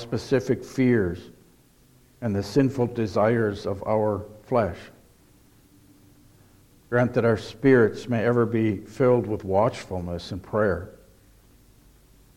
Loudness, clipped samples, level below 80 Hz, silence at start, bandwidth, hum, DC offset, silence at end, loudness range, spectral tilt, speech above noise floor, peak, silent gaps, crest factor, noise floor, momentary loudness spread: -24 LUFS; under 0.1%; -54 dBFS; 0 s; 16 kHz; none; under 0.1%; 1.45 s; 6 LU; -7.5 dB/octave; 34 dB; -6 dBFS; none; 18 dB; -57 dBFS; 11 LU